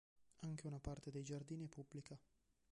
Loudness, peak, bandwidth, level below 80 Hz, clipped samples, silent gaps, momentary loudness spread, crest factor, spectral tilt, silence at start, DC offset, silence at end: -52 LUFS; -34 dBFS; 11 kHz; -66 dBFS; under 0.1%; none; 7 LU; 18 dB; -6.5 dB/octave; 0.15 s; under 0.1%; 0.55 s